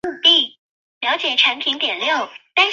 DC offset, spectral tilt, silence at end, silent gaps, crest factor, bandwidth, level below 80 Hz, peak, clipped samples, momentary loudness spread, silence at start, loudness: under 0.1%; -0.5 dB/octave; 0 s; 0.59-1.01 s; 18 dB; 7.6 kHz; -66 dBFS; -2 dBFS; under 0.1%; 10 LU; 0.05 s; -16 LUFS